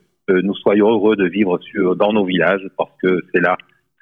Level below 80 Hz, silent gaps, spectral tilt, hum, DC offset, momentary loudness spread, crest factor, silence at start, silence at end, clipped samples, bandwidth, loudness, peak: -58 dBFS; none; -9 dB/octave; none; under 0.1%; 6 LU; 14 dB; 0.3 s; 0.45 s; under 0.1%; 4 kHz; -17 LUFS; -2 dBFS